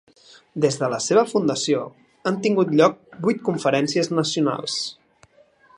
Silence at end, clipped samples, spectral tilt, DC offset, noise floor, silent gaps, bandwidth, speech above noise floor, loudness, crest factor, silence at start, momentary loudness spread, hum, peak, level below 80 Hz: 0.85 s; under 0.1%; -4.5 dB/octave; under 0.1%; -56 dBFS; none; 11 kHz; 35 dB; -21 LUFS; 20 dB; 0.55 s; 8 LU; none; -2 dBFS; -70 dBFS